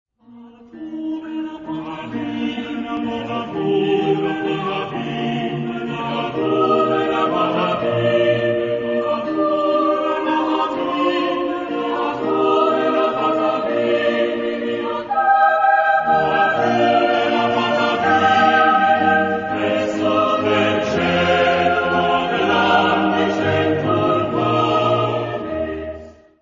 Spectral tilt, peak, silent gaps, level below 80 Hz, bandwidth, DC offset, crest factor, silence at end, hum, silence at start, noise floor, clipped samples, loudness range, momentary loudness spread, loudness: -6 dB/octave; -2 dBFS; none; -52 dBFS; 7.6 kHz; under 0.1%; 16 dB; 0.3 s; none; 0.3 s; -43 dBFS; under 0.1%; 6 LU; 10 LU; -18 LUFS